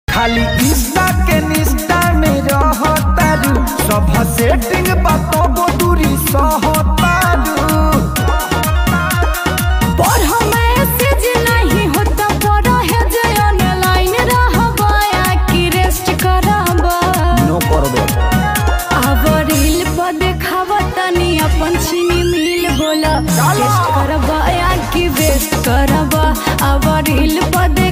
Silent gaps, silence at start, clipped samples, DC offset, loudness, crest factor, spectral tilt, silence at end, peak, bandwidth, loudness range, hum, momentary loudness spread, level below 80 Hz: none; 0.1 s; under 0.1%; 0.3%; -13 LUFS; 12 dB; -5 dB/octave; 0 s; 0 dBFS; 16.5 kHz; 1 LU; none; 3 LU; -18 dBFS